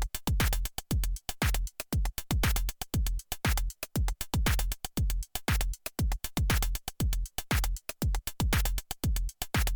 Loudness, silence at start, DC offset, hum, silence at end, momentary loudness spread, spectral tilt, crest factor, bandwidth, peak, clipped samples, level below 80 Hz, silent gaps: -32 LUFS; 0 s; under 0.1%; none; 0 s; 5 LU; -4 dB/octave; 14 dB; 19.5 kHz; -16 dBFS; under 0.1%; -32 dBFS; none